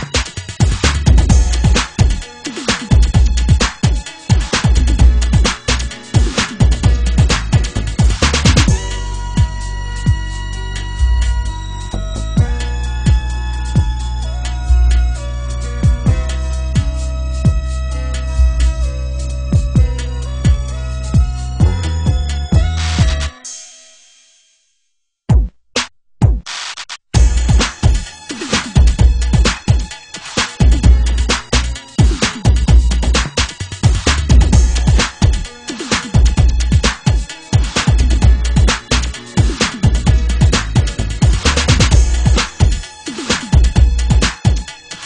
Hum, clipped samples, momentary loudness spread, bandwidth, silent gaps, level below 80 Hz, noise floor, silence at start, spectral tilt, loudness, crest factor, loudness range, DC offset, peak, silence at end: none; under 0.1%; 10 LU; 10.5 kHz; none; -16 dBFS; -68 dBFS; 0 s; -4.5 dB/octave; -15 LUFS; 12 dB; 5 LU; under 0.1%; 0 dBFS; 0 s